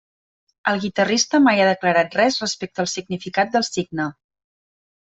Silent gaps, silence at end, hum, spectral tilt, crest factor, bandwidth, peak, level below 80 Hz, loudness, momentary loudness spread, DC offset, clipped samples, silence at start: none; 1 s; none; -3.5 dB/octave; 18 dB; 8.2 kHz; -4 dBFS; -62 dBFS; -20 LUFS; 11 LU; under 0.1%; under 0.1%; 0.65 s